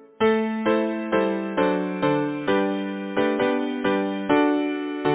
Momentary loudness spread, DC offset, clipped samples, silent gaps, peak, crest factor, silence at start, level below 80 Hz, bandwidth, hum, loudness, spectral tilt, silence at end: 4 LU; under 0.1%; under 0.1%; none; -6 dBFS; 18 dB; 0 s; -60 dBFS; 4 kHz; none; -23 LUFS; -10 dB/octave; 0 s